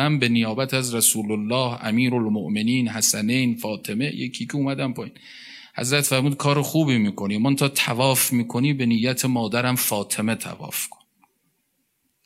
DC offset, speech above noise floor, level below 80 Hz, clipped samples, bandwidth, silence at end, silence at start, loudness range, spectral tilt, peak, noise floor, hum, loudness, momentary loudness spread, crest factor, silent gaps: under 0.1%; 49 dB; -68 dBFS; under 0.1%; 16 kHz; 1.4 s; 0 s; 4 LU; -4 dB/octave; -4 dBFS; -71 dBFS; none; -22 LUFS; 10 LU; 20 dB; none